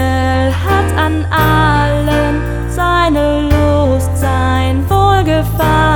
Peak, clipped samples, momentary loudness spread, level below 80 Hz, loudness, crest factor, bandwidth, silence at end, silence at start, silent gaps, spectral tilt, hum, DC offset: 0 dBFS; under 0.1%; 4 LU; -20 dBFS; -12 LUFS; 12 dB; 19.5 kHz; 0 s; 0 s; none; -6.5 dB/octave; none; under 0.1%